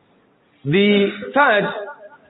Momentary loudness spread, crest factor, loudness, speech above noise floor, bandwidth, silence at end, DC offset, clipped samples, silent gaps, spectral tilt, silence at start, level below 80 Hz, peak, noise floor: 16 LU; 16 dB; -17 LUFS; 41 dB; 4.1 kHz; 0.2 s; under 0.1%; under 0.1%; none; -11 dB/octave; 0.65 s; -62 dBFS; -4 dBFS; -57 dBFS